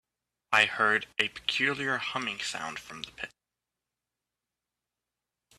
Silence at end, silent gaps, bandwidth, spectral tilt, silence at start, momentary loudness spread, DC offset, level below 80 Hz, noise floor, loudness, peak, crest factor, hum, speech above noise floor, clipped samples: 2.3 s; none; 14.5 kHz; -2 dB/octave; 0.5 s; 16 LU; under 0.1%; -70 dBFS; -89 dBFS; -28 LUFS; -8 dBFS; 26 dB; 60 Hz at -65 dBFS; 59 dB; under 0.1%